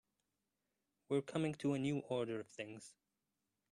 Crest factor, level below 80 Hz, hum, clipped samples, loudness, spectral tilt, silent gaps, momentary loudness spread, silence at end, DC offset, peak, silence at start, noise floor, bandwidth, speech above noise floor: 20 dB; -80 dBFS; none; under 0.1%; -41 LUFS; -6.5 dB/octave; none; 12 LU; 0.8 s; under 0.1%; -24 dBFS; 1.1 s; -89 dBFS; 11 kHz; 48 dB